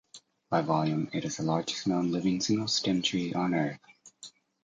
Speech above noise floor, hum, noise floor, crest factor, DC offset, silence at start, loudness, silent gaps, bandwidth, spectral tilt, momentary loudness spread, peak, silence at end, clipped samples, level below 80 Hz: 24 dB; none; -53 dBFS; 18 dB; under 0.1%; 0.15 s; -29 LUFS; none; 9.4 kHz; -5 dB/octave; 20 LU; -12 dBFS; 0.35 s; under 0.1%; -66 dBFS